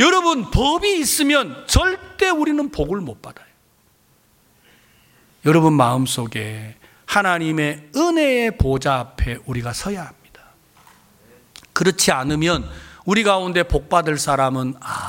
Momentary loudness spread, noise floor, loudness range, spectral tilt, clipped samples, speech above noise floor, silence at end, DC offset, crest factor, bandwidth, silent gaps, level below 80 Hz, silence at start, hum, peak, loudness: 11 LU; -58 dBFS; 6 LU; -4 dB/octave; under 0.1%; 40 dB; 0 s; under 0.1%; 18 dB; 17 kHz; none; -34 dBFS; 0 s; none; -2 dBFS; -19 LUFS